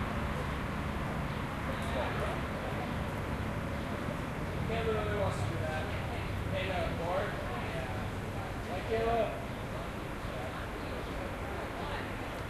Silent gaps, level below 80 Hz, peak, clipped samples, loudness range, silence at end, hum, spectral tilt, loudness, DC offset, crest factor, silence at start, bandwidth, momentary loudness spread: none; -44 dBFS; -20 dBFS; under 0.1%; 2 LU; 0 s; none; -6 dB/octave; -36 LUFS; under 0.1%; 16 dB; 0 s; 13 kHz; 6 LU